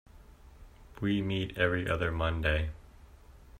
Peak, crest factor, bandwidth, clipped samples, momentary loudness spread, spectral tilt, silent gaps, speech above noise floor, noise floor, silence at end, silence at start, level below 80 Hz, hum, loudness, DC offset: -12 dBFS; 20 dB; 14.5 kHz; under 0.1%; 7 LU; -7 dB/octave; none; 24 dB; -54 dBFS; 0 s; 0.15 s; -44 dBFS; none; -31 LUFS; under 0.1%